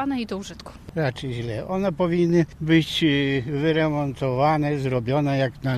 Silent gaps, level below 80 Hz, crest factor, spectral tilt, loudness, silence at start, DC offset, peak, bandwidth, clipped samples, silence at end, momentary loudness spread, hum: none; -48 dBFS; 16 dB; -7 dB/octave; -23 LUFS; 0 s; under 0.1%; -6 dBFS; 13.5 kHz; under 0.1%; 0 s; 10 LU; none